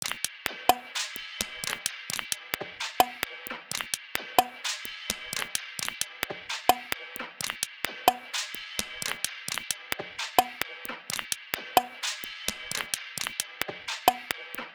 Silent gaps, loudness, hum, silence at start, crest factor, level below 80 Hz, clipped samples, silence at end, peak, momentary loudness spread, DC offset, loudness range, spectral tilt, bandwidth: none; -30 LUFS; none; 0 s; 30 dB; -62 dBFS; under 0.1%; 0 s; -2 dBFS; 8 LU; under 0.1%; 1 LU; -0.5 dB/octave; over 20 kHz